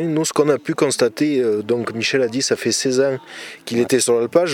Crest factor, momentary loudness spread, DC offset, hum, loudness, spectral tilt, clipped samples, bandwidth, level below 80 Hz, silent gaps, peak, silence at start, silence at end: 16 dB; 6 LU; under 0.1%; none; -18 LUFS; -4 dB/octave; under 0.1%; 17.5 kHz; -66 dBFS; none; -2 dBFS; 0 s; 0 s